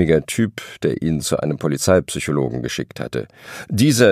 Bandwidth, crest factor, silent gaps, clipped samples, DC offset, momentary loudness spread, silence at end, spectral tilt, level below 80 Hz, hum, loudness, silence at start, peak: 15.5 kHz; 18 dB; none; under 0.1%; under 0.1%; 10 LU; 0 s; -5 dB/octave; -44 dBFS; none; -20 LUFS; 0 s; 0 dBFS